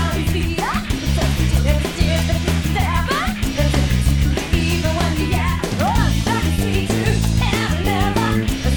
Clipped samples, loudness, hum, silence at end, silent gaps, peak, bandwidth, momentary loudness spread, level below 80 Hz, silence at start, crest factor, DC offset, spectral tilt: under 0.1%; -19 LUFS; none; 0 s; none; -2 dBFS; over 20 kHz; 3 LU; -22 dBFS; 0 s; 16 dB; 0.4%; -5.5 dB/octave